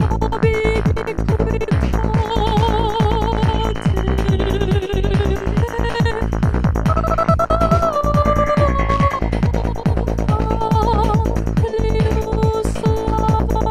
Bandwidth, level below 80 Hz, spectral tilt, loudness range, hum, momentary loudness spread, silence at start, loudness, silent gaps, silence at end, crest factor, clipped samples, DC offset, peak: 14 kHz; -22 dBFS; -7.5 dB/octave; 2 LU; none; 4 LU; 0 s; -18 LUFS; none; 0 s; 16 dB; under 0.1%; under 0.1%; -2 dBFS